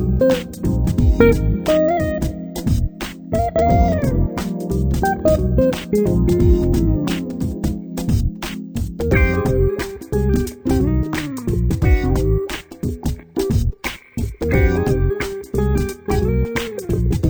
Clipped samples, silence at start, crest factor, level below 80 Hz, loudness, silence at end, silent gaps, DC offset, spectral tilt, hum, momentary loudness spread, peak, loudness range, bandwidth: under 0.1%; 0 s; 18 dB; -24 dBFS; -19 LUFS; 0 s; none; under 0.1%; -7 dB/octave; none; 9 LU; 0 dBFS; 3 LU; over 20 kHz